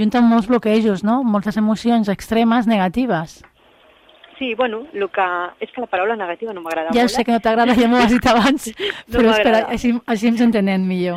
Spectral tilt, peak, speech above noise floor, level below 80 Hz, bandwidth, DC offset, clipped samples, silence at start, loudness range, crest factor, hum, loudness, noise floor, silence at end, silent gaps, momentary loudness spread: -5.5 dB/octave; -2 dBFS; 35 dB; -44 dBFS; 14.5 kHz; under 0.1%; under 0.1%; 0 s; 7 LU; 14 dB; none; -17 LUFS; -51 dBFS; 0 s; none; 10 LU